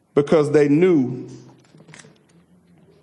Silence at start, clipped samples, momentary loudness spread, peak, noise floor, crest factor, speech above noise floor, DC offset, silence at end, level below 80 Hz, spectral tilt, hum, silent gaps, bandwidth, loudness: 0.15 s; under 0.1%; 17 LU; -4 dBFS; -55 dBFS; 16 dB; 38 dB; under 0.1%; 1.65 s; -64 dBFS; -7.5 dB/octave; none; none; 11 kHz; -17 LUFS